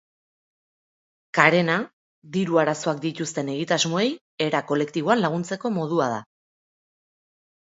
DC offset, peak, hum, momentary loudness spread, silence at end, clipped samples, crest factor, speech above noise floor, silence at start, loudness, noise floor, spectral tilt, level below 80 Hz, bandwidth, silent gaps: under 0.1%; 0 dBFS; none; 9 LU; 1.55 s; under 0.1%; 24 dB; over 67 dB; 1.35 s; -23 LUFS; under -90 dBFS; -4.5 dB/octave; -72 dBFS; 8 kHz; 1.93-2.22 s, 4.21-4.38 s